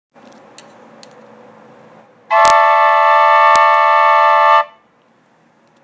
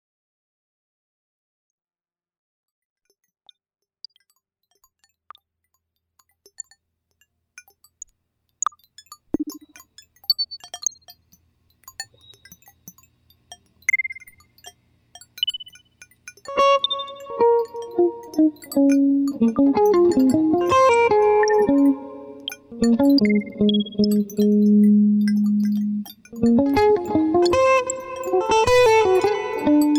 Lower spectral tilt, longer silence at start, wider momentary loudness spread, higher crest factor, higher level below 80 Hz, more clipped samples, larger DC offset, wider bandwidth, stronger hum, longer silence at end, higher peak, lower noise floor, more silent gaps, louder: second, -0.5 dB/octave vs -5 dB/octave; second, 2.3 s vs 9.1 s; second, 4 LU vs 17 LU; about the same, 14 dB vs 12 dB; about the same, -58 dBFS vs -54 dBFS; neither; neither; second, 8 kHz vs 19.5 kHz; neither; first, 1.15 s vs 0 s; first, 0 dBFS vs -8 dBFS; second, -53 dBFS vs under -90 dBFS; neither; first, -10 LUFS vs -19 LUFS